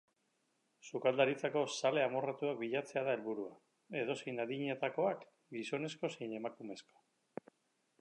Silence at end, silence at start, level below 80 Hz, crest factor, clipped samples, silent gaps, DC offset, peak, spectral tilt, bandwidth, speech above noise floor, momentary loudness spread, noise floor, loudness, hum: 1.2 s; 0.85 s; under -90 dBFS; 24 dB; under 0.1%; none; under 0.1%; -16 dBFS; -5 dB/octave; 11 kHz; 43 dB; 16 LU; -80 dBFS; -38 LUFS; none